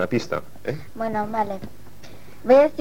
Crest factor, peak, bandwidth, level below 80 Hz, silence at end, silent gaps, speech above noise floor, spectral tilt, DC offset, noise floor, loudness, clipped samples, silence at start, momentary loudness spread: 18 dB; -4 dBFS; 16.5 kHz; -54 dBFS; 0.1 s; none; 24 dB; -6.5 dB/octave; 2%; -45 dBFS; -23 LUFS; under 0.1%; 0 s; 17 LU